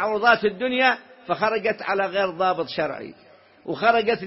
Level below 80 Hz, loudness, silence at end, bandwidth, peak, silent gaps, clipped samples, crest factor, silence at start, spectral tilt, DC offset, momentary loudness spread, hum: -62 dBFS; -22 LUFS; 0 s; 6 kHz; -2 dBFS; none; under 0.1%; 20 dB; 0 s; -7.5 dB/octave; under 0.1%; 13 LU; none